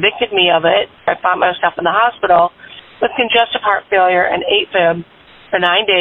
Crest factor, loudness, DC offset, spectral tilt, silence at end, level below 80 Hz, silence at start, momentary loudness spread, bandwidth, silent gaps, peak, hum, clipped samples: 14 dB; -14 LUFS; under 0.1%; -6.5 dB/octave; 0 s; -52 dBFS; 0 s; 7 LU; 4.1 kHz; none; -2 dBFS; none; under 0.1%